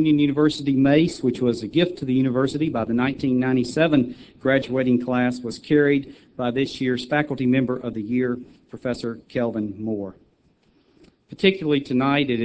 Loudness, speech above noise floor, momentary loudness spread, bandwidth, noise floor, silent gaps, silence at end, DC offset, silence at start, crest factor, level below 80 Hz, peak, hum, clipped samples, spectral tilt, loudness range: -22 LUFS; 40 dB; 10 LU; 8 kHz; -61 dBFS; none; 0 s; under 0.1%; 0 s; 20 dB; -54 dBFS; -2 dBFS; none; under 0.1%; -7 dB/octave; 6 LU